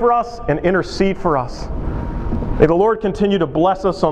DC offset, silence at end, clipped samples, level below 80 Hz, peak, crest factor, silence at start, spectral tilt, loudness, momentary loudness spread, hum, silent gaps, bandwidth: under 0.1%; 0 s; under 0.1%; -28 dBFS; 0 dBFS; 16 dB; 0 s; -7 dB/octave; -18 LUFS; 10 LU; none; none; 9.6 kHz